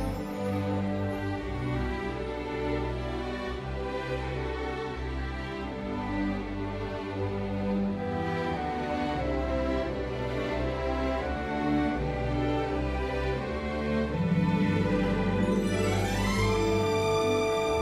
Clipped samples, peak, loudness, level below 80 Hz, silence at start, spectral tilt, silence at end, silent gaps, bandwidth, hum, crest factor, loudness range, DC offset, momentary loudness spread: under 0.1%; -14 dBFS; -30 LUFS; -40 dBFS; 0 s; -6.5 dB/octave; 0 s; none; 15 kHz; none; 14 dB; 6 LU; under 0.1%; 8 LU